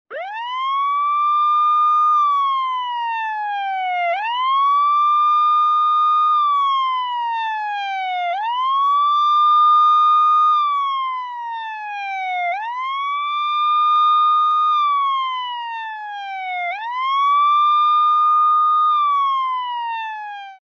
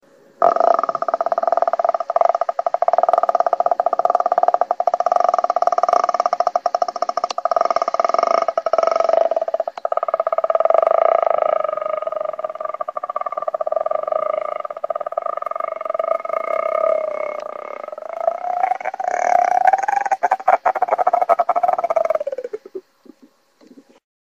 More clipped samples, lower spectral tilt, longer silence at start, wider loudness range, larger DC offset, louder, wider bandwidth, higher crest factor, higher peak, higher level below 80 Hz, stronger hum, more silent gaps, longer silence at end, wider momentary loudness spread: neither; second, 2.5 dB/octave vs -2.5 dB/octave; second, 0.1 s vs 0.4 s; about the same, 4 LU vs 5 LU; neither; about the same, -17 LUFS vs -19 LUFS; second, 6.4 kHz vs 7.4 kHz; second, 10 dB vs 18 dB; second, -8 dBFS vs 0 dBFS; second, under -90 dBFS vs -68 dBFS; neither; neither; second, 0.1 s vs 1.55 s; first, 12 LU vs 9 LU